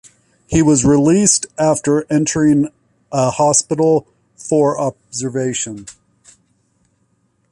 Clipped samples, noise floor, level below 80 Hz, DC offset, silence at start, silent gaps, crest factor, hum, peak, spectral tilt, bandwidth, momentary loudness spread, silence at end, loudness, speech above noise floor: under 0.1%; -62 dBFS; -44 dBFS; under 0.1%; 0.5 s; none; 16 dB; none; 0 dBFS; -5 dB/octave; 11.5 kHz; 11 LU; 1.6 s; -15 LUFS; 47 dB